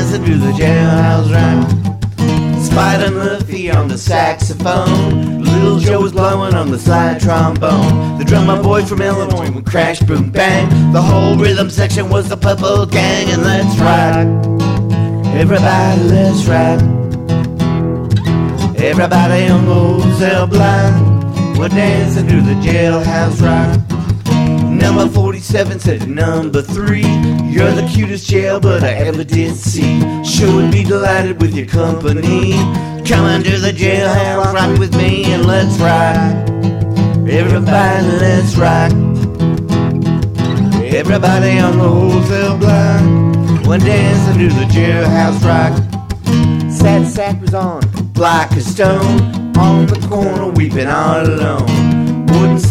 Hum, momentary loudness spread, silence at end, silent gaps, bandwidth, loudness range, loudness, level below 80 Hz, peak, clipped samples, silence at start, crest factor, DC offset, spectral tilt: none; 5 LU; 0 s; none; 14 kHz; 2 LU; -12 LUFS; -32 dBFS; 0 dBFS; under 0.1%; 0 s; 10 dB; under 0.1%; -6.5 dB/octave